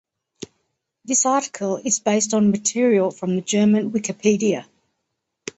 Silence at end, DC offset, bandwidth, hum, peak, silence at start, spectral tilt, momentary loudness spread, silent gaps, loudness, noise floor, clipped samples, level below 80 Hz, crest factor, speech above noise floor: 0.95 s; under 0.1%; 8.2 kHz; none; -4 dBFS; 0.4 s; -4.5 dB/octave; 17 LU; none; -20 LUFS; -78 dBFS; under 0.1%; -64 dBFS; 16 dB; 58 dB